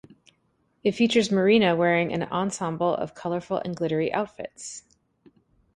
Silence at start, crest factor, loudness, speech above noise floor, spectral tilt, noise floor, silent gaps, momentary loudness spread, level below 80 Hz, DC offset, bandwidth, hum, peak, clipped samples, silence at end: 0.85 s; 18 dB; -24 LUFS; 45 dB; -5 dB/octave; -69 dBFS; none; 16 LU; -64 dBFS; under 0.1%; 11.5 kHz; none; -8 dBFS; under 0.1%; 0.95 s